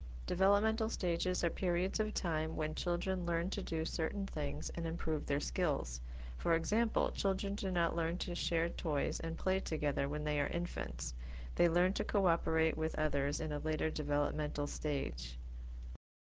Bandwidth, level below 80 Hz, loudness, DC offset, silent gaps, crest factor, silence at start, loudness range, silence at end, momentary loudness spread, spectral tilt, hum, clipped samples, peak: 8 kHz; -44 dBFS; -36 LUFS; under 0.1%; none; 18 dB; 0 s; 2 LU; 0.35 s; 9 LU; -5 dB/octave; none; under 0.1%; -18 dBFS